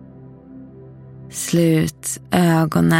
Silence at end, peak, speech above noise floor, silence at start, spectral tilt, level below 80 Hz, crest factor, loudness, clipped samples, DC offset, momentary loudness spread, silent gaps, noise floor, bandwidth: 0 s; -2 dBFS; 24 dB; 0 s; -5.5 dB/octave; -48 dBFS; 18 dB; -18 LUFS; under 0.1%; under 0.1%; 24 LU; none; -41 dBFS; 16.5 kHz